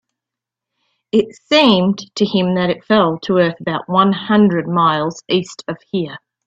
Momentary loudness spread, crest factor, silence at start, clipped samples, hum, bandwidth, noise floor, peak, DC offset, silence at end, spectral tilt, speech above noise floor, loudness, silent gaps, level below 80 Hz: 10 LU; 16 dB; 1.15 s; under 0.1%; none; 7.8 kHz; -84 dBFS; 0 dBFS; under 0.1%; 0.3 s; -6 dB/octave; 69 dB; -16 LUFS; none; -56 dBFS